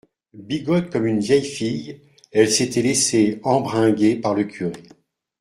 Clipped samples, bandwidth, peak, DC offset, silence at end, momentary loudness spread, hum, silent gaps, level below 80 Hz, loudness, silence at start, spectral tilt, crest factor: under 0.1%; 15.5 kHz; -2 dBFS; under 0.1%; 0.6 s; 12 LU; none; none; -58 dBFS; -20 LUFS; 0.35 s; -4.5 dB/octave; 18 dB